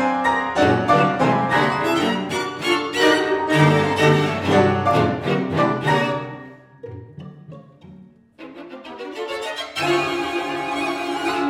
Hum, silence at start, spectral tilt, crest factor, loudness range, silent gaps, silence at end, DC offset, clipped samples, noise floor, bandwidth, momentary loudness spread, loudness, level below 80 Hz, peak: none; 0 s; -5.5 dB/octave; 18 dB; 14 LU; none; 0 s; under 0.1%; under 0.1%; -46 dBFS; 16.5 kHz; 21 LU; -19 LUFS; -54 dBFS; -2 dBFS